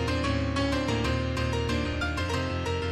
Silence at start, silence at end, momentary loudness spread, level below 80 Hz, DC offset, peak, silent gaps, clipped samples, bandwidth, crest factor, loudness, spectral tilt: 0 s; 0 s; 2 LU; -36 dBFS; under 0.1%; -14 dBFS; none; under 0.1%; 12.5 kHz; 12 dB; -28 LUFS; -5.5 dB/octave